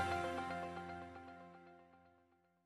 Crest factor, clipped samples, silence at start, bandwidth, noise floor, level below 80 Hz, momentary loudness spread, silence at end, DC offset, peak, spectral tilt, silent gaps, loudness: 20 dB; under 0.1%; 0 s; 13.5 kHz; -75 dBFS; -70 dBFS; 22 LU; 0.55 s; under 0.1%; -28 dBFS; -5.5 dB/octave; none; -45 LUFS